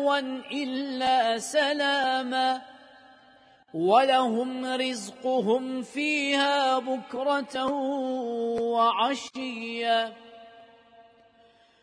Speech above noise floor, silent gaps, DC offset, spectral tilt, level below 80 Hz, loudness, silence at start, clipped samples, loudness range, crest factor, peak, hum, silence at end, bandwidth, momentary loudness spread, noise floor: 33 dB; none; under 0.1%; -3 dB/octave; -74 dBFS; -26 LUFS; 0 s; under 0.1%; 3 LU; 18 dB; -8 dBFS; none; 0.8 s; 11 kHz; 9 LU; -59 dBFS